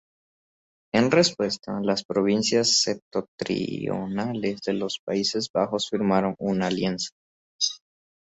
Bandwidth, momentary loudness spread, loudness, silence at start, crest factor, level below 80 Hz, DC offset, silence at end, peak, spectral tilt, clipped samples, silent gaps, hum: 8.4 kHz; 9 LU; -25 LUFS; 0.95 s; 20 dB; -62 dBFS; under 0.1%; 0.6 s; -6 dBFS; -4 dB/octave; under 0.1%; 2.05-2.09 s, 3.02-3.11 s, 3.28-3.38 s, 4.99-5.07 s, 5.50-5.54 s, 7.12-7.59 s; none